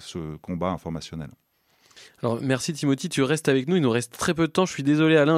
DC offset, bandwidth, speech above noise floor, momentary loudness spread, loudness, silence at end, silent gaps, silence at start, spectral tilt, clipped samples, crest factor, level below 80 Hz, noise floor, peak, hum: under 0.1%; 15 kHz; 38 dB; 13 LU; -24 LUFS; 0 s; none; 0 s; -5.5 dB/octave; under 0.1%; 18 dB; -56 dBFS; -62 dBFS; -6 dBFS; none